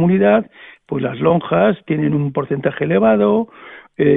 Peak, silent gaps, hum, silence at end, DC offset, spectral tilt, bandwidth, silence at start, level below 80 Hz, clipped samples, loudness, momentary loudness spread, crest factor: -2 dBFS; none; none; 0 s; under 0.1%; -11.5 dB/octave; 3.9 kHz; 0 s; -52 dBFS; under 0.1%; -16 LUFS; 11 LU; 14 dB